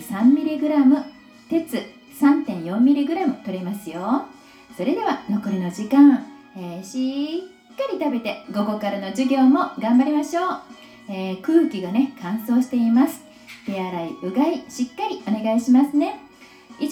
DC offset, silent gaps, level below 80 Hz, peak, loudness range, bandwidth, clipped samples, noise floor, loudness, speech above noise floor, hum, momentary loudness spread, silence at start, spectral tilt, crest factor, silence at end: under 0.1%; none; -68 dBFS; -4 dBFS; 2 LU; 15.5 kHz; under 0.1%; -46 dBFS; -21 LUFS; 26 dB; none; 14 LU; 0 s; -6.5 dB/octave; 16 dB; 0 s